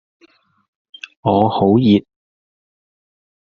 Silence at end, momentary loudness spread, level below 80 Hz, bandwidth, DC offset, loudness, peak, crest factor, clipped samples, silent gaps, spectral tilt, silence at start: 1.5 s; 20 LU; -56 dBFS; 6.6 kHz; under 0.1%; -15 LUFS; 0 dBFS; 18 dB; under 0.1%; none; -7 dB/octave; 1.25 s